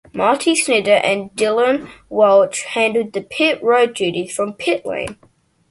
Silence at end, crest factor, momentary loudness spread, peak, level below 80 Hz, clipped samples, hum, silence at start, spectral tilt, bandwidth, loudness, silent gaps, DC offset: 0.55 s; 16 dB; 10 LU; 0 dBFS; -56 dBFS; under 0.1%; none; 0.15 s; -3 dB/octave; 11.5 kHz; -17 LUFS; none; under 0.1%